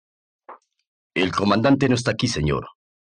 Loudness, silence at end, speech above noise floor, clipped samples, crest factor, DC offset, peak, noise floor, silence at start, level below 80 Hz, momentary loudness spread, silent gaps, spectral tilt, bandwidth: -21 LUFS; 0.35 s; 27 dB; under 0.1%; 18 dB; under 0.1%; -6 dBFS; -47 dBFS; 0.5 s; -46 dBFS; 8 LU; 0.87-1.10 s; -5.5 dB/octave; 10 kHz